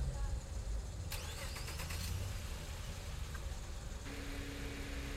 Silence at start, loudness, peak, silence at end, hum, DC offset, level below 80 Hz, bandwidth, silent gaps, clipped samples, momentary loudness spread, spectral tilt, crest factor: 0 s; -45 LUFS; -28 dBFS; 0 s; none; under 0.1%; -44 dBFS; 16 kHz; none; under 0.1%; 5 LU; -4 dB/octave; 14 dB